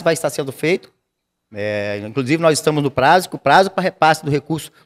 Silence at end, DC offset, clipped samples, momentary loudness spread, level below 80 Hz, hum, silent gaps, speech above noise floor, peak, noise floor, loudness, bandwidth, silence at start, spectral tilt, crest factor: 0.15 s; under 0.1%; under 0.1%; 10 LU; -56 dBFS; none; none; 58 dB; 0 dBFS; -75 dBFS; -17 LUFS; 16 kHz; 0 s; -5 dB/octave; 18 dB